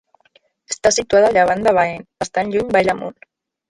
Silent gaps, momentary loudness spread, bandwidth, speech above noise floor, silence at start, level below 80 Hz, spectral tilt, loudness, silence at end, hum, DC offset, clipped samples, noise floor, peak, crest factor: none; 12 LU; 11.5 kHz; 41 dB; 0.7 s; -50 dBFS; -3.5 dB/octave; -17 LUFS; 0.6 s; none; under 0.1%; under 0.1%; -58 dBFS; -2 dBFS; 16 dB